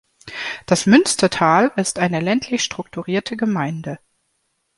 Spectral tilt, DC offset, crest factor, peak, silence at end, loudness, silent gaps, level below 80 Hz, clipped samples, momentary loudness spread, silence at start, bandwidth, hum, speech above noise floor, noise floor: -4.5 dB/octave; under 0.1%; 18 dB; -2 dBFS; 0.8 s; -18 LUFS; none; -56 dBFS; under 0.1%; 15 LU; 0.25 s; 11.5 kHz; none; 52 dB; -69 dBFS